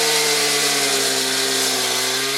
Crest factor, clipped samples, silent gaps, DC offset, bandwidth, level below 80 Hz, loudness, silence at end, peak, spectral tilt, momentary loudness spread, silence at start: 14 dB; under 0.1%; none; under 0.1%; 16 kHz; -78 dBFS; -17 LUFS; 0 s; -4 dBFS; 0 dB/octave; 2 LU; 0 s